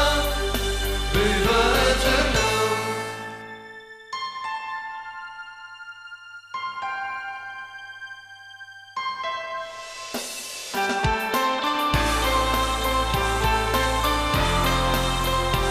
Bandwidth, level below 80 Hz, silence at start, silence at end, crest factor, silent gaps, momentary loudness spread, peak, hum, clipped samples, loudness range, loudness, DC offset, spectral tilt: 15.5 kHz; -32 dBFS; 0 s; 0 s; 18 dB; none; 19 LU; -6 dBFS; none; under 0.1%; 12 LU; -23 LUFS; under 0.1%; -3.5 dB/octave